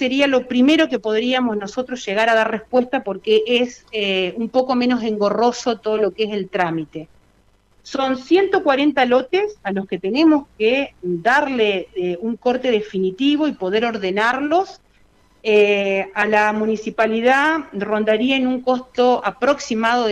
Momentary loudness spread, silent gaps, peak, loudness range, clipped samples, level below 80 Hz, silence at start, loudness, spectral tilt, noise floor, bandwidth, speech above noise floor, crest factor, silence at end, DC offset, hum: 8 LU; none; -4 dBFS; 3 LU; under 0.1%; -58 dBFS; 0 s; -18 LUFS; -5 dB/octave; -57 dBFS; 9.8 kHz; 39 dB; 14 dB; 0 s; under 0.1%; none